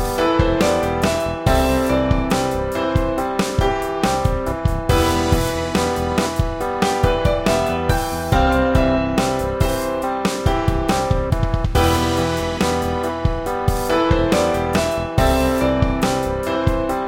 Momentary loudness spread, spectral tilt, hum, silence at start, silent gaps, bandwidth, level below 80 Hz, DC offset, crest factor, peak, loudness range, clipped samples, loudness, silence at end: 4 LU; -5.5 dB/octave; none; 0 s; none; 17 kHz; -26 dBFS; under 0.1%; 16 dB; -2 dBFS; 1 LU; under 0.1%; -19 LUFS; 0 s